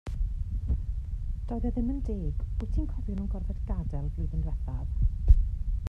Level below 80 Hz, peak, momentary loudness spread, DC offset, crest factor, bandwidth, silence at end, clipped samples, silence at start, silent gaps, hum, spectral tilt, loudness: -30 dBFS; -6 dBFS; 9 LU; under 0.1%; 22 dB; 3.1 kHz; 0 s; under 0.1%; 0.05 s; none; none; -10 dB/octave; -32 LUFS